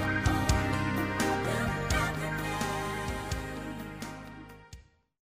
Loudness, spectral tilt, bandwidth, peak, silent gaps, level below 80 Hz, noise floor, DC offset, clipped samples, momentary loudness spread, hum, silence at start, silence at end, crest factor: -31 LUFS; -5 dB/octave; 15.5 kHz; -14 dBFS; none; -40 dBFS; -53 dBFS; under 0.1%; under 0.1%; 15 LU; none; 0 s; 0.5 s; 18 dB